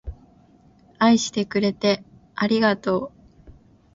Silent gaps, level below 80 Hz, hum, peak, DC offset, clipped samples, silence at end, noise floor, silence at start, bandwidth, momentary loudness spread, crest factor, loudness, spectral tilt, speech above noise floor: none; -48 dBFS; none; -4 dBFS; under 0.1%; under 0.1%; 0.45 s; -54 dBFS; 0.05 s; 7.8 kHz; 15 LU; 20 dB; -22 LUFS; -4.5 dB/octave; 34 dB